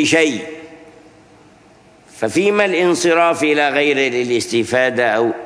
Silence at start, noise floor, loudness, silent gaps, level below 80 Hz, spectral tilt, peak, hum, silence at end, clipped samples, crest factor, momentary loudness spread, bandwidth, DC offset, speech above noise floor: 0 s; -47 dBFS; -15 LUFS; none; -62 dBFS; -3.5 dB/octave; 0 dBFS; none; 0 s; under 0.1%; 16 dB; 7 LU; 11 kHz; under 0.1%; 32 dB